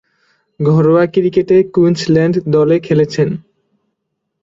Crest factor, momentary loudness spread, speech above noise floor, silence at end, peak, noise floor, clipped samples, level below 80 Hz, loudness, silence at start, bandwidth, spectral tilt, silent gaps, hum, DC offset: 12 dB; 7 LU; 61 dB; 1 s; -2 dBFS; -72 dBFS; under 0.1%; -52 dBFS; -13 LUFS; 0.6 s; 7.8 kHz; -8 dB/octave; none; none; under 0.1%